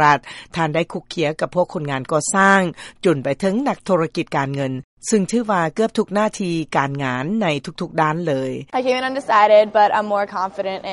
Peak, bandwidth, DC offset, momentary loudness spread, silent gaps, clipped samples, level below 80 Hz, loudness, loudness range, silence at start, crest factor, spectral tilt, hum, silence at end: -2 dBFS; 11.5 kHz; under 0.1%; 10 LU; 4.84-4.97 s; under 0.1%; -56 dBFS; -19 LUFS; 3 LU; 0 s; 18 dB; -5 dB/octave; none; 0 s